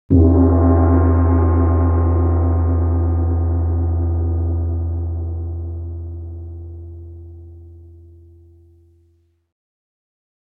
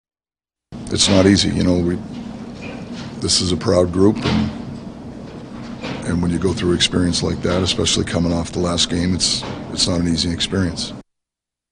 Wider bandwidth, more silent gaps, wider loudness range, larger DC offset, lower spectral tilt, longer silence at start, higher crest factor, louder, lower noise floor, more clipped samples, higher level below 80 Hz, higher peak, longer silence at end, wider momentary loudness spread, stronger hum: second, 2.2 kHz vs 10.5 kHz; neither; first, 20 LU vs 3 LU; neither; first, -14.5 dB/octave vs -4.5 dB/octave; second, 0.1 s vs 0.7 s; about the same, 16 dB vs 18 dB; about the same, -17 LUFS vs -18 LUFS; second, -59 dBFS vs under -90 dBFS; neither; first, -24 dBFS vs -38 dBFS; about the same, 0 dBFS vs 0 dBFS; first, 2.7 s vs 0.7 s; first, 20 LU vs 17 LU; neither